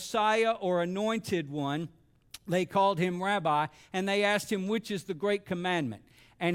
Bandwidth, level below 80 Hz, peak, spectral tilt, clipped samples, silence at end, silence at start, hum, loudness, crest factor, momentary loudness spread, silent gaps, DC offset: 17 kHz; -68 dBFS; -14 dBFS; -5 dB/octave; under 0.1%; 0 s; 0 s; none; -30 LUFS; 16 dB; 10 LU; none; under 0.1%